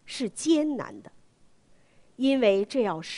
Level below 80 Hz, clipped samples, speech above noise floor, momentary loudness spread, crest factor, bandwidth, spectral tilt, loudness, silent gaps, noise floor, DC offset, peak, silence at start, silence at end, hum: -68 dBFS; under 0.1%; 33 dB; 11 LU; 18 dB; 11 kHz; -4.5 dB/octave; -26 LUFS; none; -59 dBFS; under 0.1%; -10 dBFS; 0.05 s; 0 s; none